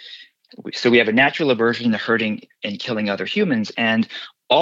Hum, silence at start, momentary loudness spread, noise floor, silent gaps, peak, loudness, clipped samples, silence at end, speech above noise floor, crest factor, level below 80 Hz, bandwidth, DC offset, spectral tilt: none; 0 s; 14 LU; -42 dBFS; none; -4 dBFS; -19 LUFS; under 0.1%; 0 s; 23 dB; 16 dB; -66 dBFS; 7.6 kHz; under 0.1%; -5.5 dB/octave